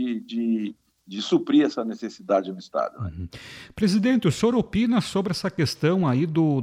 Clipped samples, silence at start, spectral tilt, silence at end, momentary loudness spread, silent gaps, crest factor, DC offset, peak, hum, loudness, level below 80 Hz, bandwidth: under 0.1%; 0 s; -6.5 dB/octave; 0 s; 14 LU; none; 14 dB; under 0.1%; -8 dBFS; none; -24 LUFS; -52 dBFS; 15 kHz